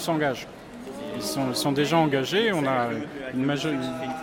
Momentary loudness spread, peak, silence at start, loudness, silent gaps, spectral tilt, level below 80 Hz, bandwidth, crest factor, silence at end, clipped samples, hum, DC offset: 13 LU; -10 dBFS; 0 s; -25 LUFS; none; -5 dB/octave; -60 dBFS; 17 kHz; 16 dB; 0 s; under 0.1%; none; under 0.1%